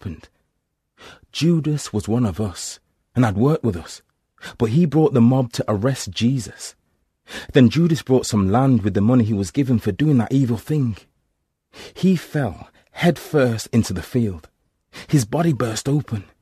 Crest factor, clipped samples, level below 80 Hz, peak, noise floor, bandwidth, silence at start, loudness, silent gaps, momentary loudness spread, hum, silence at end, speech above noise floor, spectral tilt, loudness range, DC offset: 20 dB; under 0.1%; -48 dBFS; 0 dBFS; -74 dBFS; 14 kHz; 0.05 s; -20 LUFS; none; 19 LU; none; 0.2 s; 55 dB; -6.5 dB/octave; 4 LU; under 0.1%